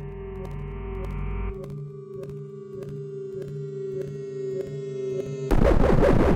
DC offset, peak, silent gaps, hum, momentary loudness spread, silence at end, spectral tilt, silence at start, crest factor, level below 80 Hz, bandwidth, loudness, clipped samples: under 0.1%; -6 dBFS; none; none; 17 LU; 0 s; -8 dB/octave; 0 s; 18 dB; -30 dBFS; 9.6 kHz; -29 LUFS; under 0.1%